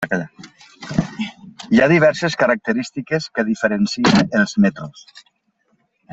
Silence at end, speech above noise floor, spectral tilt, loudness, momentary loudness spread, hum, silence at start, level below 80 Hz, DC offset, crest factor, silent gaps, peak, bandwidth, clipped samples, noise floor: 0.95 s; 48 dB; -5.5 dB/octave; -18 LUFS; 17 LU; none; 0 s; -52 dBFS; under 0.1%; 18 dB; none; -2 dBFS; 8 kHz; under 0.1%; -65 dBFS